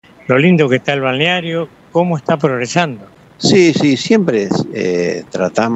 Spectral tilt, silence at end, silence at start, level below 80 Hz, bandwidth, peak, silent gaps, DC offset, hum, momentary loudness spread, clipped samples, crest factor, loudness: -5.5 dB/octave; 0 s; 0.25 s; -56 dBFS; 8.4 kHz; 0 dBFS; none; under 0.1%; none; 9 LU; under 0.1%; 14 dB; -14 LUFS